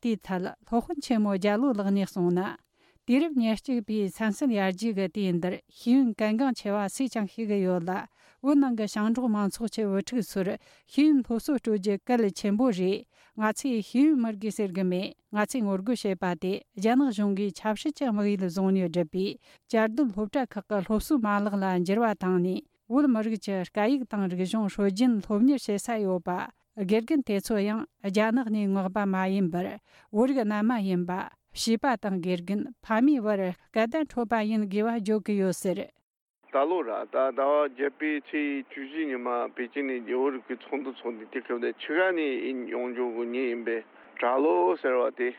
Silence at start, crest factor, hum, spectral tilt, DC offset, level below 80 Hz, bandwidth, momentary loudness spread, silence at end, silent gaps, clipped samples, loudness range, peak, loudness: 0.05 s; 14 dB; none; -6 dB/octave; under 0.1%; -60 dBFS; 15 kHz; 9 LU; 0 s; 36.03-36.14 s, 36.21-36.34 s; under 0.1%; 2 LU; -14 dBFS; -28 LUFS